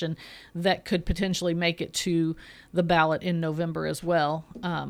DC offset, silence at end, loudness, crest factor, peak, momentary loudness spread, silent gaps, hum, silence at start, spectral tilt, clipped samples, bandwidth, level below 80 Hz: under 0.1%; 0 s; -27 LUFS; 20 dB; -8 dBFS; 9 LU; none; none; 0 s; -5 dB/octave; under 0.1%; 15.5 kHz; -44 dBFS